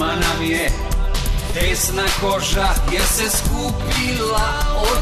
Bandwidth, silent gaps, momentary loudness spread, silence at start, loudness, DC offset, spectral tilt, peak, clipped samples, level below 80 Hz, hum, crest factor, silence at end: 14 kHz; none; 5 LU; 0 s; -19 LUFS; under 0.1%; -3 dB/octave; -6 dBFS; under 0.1%; -22 dBFS; none; 12 dB; 0 s